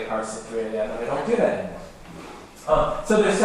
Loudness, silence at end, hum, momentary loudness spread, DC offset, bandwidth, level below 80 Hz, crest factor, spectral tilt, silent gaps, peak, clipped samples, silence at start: -24 LUFS; 0 s; none; 19 LU; under 0.1%; 14 kHz; -42 dBFS; 18 dB; -5 dB/octave; none; -6 dBFS; under 0.1%; 0 s